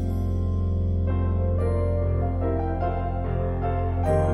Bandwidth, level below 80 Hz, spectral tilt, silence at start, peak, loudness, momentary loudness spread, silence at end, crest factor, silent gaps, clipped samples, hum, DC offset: 3.5 kHz; -30 dBFS; -10 dB/octave; 0 s; -10 dBFS; -26 LUFS; 3 LU; 0 s; 12 dB; none; under 0.1%; none; under 0.1%